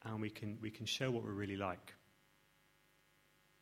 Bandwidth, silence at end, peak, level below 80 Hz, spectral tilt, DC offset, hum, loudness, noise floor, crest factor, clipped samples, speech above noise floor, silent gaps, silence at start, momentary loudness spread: 16 kHz; 1.65 s; -24 dBFS; -76 dBFS; -5 dB/octave; under 0.1%; 50 Hz at -70 dBFS; -43 LUFS; -73 dBFS; 22 dB; under 0.1%; 31 dB; none; 0 s; 9 LU